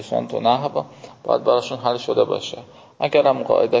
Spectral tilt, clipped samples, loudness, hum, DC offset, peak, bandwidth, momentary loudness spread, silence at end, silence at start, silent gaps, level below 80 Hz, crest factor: -5.5 dB/octave; under 0.1%; -20 LUFS; none; under 0.1%; -4 dBFS; 7.8 kHz; 13 LU; 0 s; 0 s; none; -64 dBFS; 18 dB